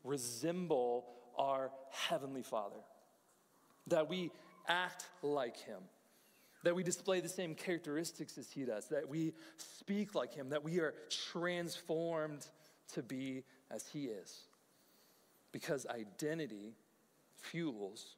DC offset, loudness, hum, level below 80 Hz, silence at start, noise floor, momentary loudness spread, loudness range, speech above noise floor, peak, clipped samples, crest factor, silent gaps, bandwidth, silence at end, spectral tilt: under 0.1%; -41 LUFS; none; under -90 dBFS; 0.05 s; -73 dBFS; 14 LU; 6 LU; 32 dB; -18 dBFS; under 0.1%; 24 dB; none; 16 kHz; 0.05 s; -4 dB/octave